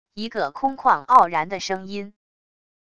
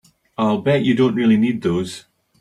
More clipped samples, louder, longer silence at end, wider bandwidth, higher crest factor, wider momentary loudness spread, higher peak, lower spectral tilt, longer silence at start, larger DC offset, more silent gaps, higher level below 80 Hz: neither; about the same, -20 LUFS vs -18 LUFS; first, 0.75 s vs 0.4 s; second, 9 kHz vs 11.5 kHz; first, 22 dB vs 14 dB; first, 18 LU vs 15 LU; first, 0 dBFS vs -6 dBFS; second, -4 dB/octave vs -7 dB/octave; second, 0.15 s vs 0.4 s; first, 0.5% vs under 0.1%; neither; second, -62 dBFS vs -56 dBFS